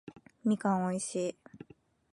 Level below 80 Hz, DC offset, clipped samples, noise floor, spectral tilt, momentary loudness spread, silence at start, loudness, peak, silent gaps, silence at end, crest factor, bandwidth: -74 dBFS; under 0.1%; under 0.1%; -58 dBFS; -6 dB/octave; 23 LU; 0.05 s; -33 LUFS; -18 dBFS; none; 0.55 s; 18 dB; 11.5 kHz